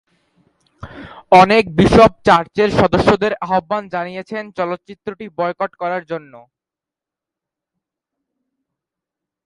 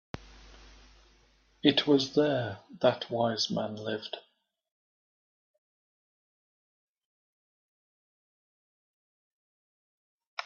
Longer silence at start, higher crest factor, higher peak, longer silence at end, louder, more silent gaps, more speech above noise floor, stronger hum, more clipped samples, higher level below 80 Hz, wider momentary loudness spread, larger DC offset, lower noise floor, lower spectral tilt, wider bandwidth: first, 0.85 s vs 0.15 s; second, 18 dB vs 30 dB; first, 0 dBFS vs -6 dBFS; first, 3.1 s vs 0 s; first, -15 LUFS vs -29 LUFS; second, none vs 4.72-6.95 s, 7.05-10.20 s, 10.27-10.37 s; first, 72 dB vs 36 dB; neither; neither; first, -40 dBFS vs -64 dBFS; about the same, 19 LU vs 17 LU; neither; first, -87 dBFS vs -65 dBFS; first, -6.5 dB/octave vs -5 dB/octave; first, 11.5 kHz vs 7.2 kHz